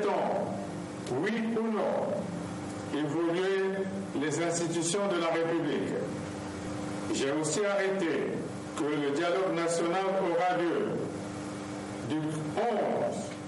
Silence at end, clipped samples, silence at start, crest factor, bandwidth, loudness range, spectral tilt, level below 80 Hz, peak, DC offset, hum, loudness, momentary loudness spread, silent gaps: 0 s; under 0.1%; 0 s; 14 dB; 11.5 kHz; 2 LU; -5 dB/octave; -66 dBFS; -18 dBFS; under 0.1%; none; -31 LUFS; 9 LU; none